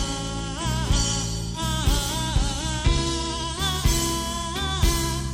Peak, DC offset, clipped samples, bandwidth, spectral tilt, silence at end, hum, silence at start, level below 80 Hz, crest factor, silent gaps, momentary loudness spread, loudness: -8 dBFS; under 0.1%; under 0.1%; 16.5 kHz; -3.5 dB/octave; 0 s; none; 0 s; -28 dBFS; 16 dB; none; 5 LU; -25 LUFS